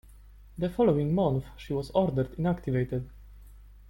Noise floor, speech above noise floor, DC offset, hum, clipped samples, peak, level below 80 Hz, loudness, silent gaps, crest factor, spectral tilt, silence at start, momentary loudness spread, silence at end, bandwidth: -51 dBFS; 23 dB; under 0.1%; 50 Hz at -45 dBFS; under 0.1%; -12 dBFS; -48 dBFS; -29 LUFS; none; 18 dB; -9 dB/octave; 0.25 s; 10 LU; 0.15 s; 16.5 kHz